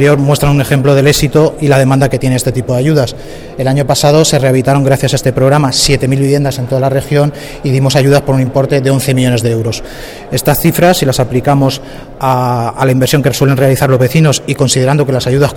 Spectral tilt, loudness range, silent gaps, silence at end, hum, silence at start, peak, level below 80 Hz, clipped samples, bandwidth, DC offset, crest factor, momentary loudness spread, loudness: -5.5 dB/octave; 2 LU; none; 0 s; none; 0 s; 0 dBFS; -32 dBFS; under 0.1%; 18.5 kHz; under 0.1%; 10 dB; 6 LU; -10 LUFS